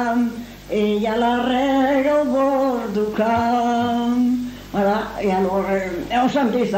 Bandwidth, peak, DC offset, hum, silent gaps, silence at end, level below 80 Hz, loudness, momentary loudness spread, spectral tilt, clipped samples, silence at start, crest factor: 16 kHz; -6 dBFS; under 0.1%; none; none; 0 s; -46 dBFS; -20 LUFS; 5 LU; -6 dB/octave; under 0.1%; 0 s; 12 dB